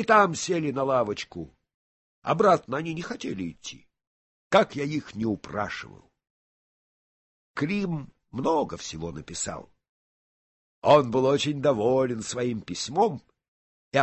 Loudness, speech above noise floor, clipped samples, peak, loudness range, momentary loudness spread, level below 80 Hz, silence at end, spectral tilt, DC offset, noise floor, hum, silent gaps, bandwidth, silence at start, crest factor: -26 LUFS; over 65 dB; under 0.1%; -6 dBFS; 8 LU; 17 LU; -58 dBFS; 0 s; -5 dB/octave; under 0.1%; under -90 dBFS; none; 1.74-2.22 s, 4.07-4.51 s, 6.30-7.54 s, 9.89-10.82 s, 13.48-13.91 s; 8.6 kHz; 0 s; 22 dB